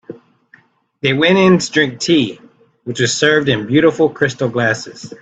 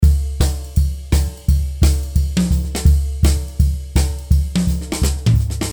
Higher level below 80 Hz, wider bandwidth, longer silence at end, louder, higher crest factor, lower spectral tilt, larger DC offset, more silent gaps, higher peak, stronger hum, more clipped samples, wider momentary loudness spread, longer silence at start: second, -52 dBFS vs -18 dBFS; second, 9 kHz vs over 20 kHz; about the same, 0.05 s vs 0 s; first, -14 LUFS vs -18 LUFS; about the same, 16 dB vs 14 dB; second, -4.5 dB/octave vs -6 dB/octave; neither; neither; about the same, 0 dBFS vs -2 dBFS; neither; neither; first, 11 LU vs 4 LU; about the same, 0.1 s vs 0 s